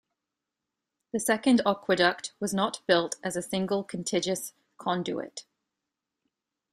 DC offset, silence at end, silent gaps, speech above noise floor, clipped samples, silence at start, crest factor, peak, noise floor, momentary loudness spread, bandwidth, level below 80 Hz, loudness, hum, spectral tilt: under 0.1%; 1.3 s; none; 59 dB; under 0.1%; 1.15 s; 22 dB; -8 dBFS; -87 dBFS; 12 LU; 15.5 kHz; -70 dBFS; -28 LUFS; none; -4 dB/octave